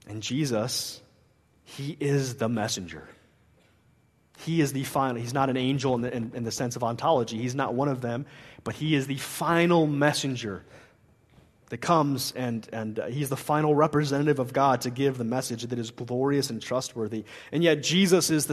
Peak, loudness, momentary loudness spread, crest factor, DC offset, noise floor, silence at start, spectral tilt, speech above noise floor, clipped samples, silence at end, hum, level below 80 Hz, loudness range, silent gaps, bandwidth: -6 dBFS; -27 LUFS; 12 LU; 22 dB; under 0.1%; -63 dBFS; 0.05 s; -5 dB/octave; 37 dB; under 0.1%; 0 s; none; -64 dBFS; 5 LU; none; 13.5 kHz